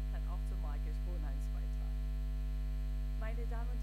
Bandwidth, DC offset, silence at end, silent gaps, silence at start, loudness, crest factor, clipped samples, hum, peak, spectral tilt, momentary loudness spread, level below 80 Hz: 8.4 kHz; under 0.1%; 0 s; none; 0 s; -41 LUFS; 8 dB; under 0.1%; none; -28 dBFS; -7 dB/octave; 0 LU; -36 dBFS